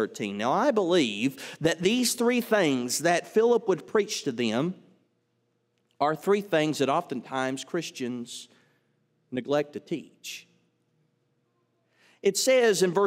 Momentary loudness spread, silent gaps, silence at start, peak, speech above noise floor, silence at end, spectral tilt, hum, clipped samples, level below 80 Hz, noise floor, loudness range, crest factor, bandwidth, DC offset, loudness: 13 LU; none; 0 s; -10 dBFS; 48 dB; 0 s; -4 dB/octave; none; under 0.1%; -74 dBFS; -74 dBFS; 11 LU; 18 dB; 16 kHz; under 0.1%; -26 LUFS